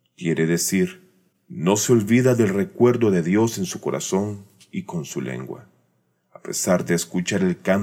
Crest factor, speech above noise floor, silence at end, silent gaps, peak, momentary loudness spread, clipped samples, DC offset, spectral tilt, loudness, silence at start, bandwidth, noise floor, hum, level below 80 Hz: 18 dB; 46 dB; 0 s; none; -4 dBFS; 16 LU; under 0.1%; under 0.1%; -5.5 dB/octave; -21 LUFS; 0.2 s; 17 kHz; -67 dBFS; none; -66 dBFS